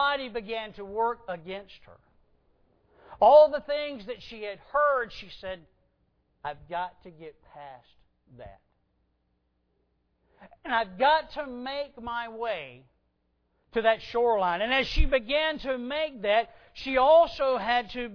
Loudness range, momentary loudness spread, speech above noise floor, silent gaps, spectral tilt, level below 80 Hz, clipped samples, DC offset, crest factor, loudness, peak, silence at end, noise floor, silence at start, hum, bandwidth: 16 LU; 20 LU; 47 dB; none; -5.5 dB/octave; -40 dBFS; under 0.1%; under 0.1%; 22 dB; -26 LUFS; -8 dBFS; 0 s; -74 dBFS; 0 s; none; 5.4 kHz